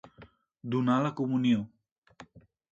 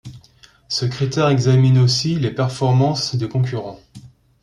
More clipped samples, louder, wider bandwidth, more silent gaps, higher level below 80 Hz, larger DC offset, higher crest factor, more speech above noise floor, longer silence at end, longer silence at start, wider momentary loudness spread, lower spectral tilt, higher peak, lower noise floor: neither; second, -29 LUFS vs -18 LUFS; second, 7.4 kHz vs 10.5 kHz; first, 1.92-2.02 s vs none; second, -70 dBFS vs -52 dBFS; neither; about the same, 18 dB vs 14 dB; second, 29 dB vs 34 dB; about the same, 0.3 s vs 0.35 s; about the same, 0.05 s vs 0.05 s; first, 15 LU vs 9 LU; first, -7.5 dB/octave vs -6 dB/octave; second, -14 dBFS vs -4 dBFS; first, -57 dBFS vs -50 dBFS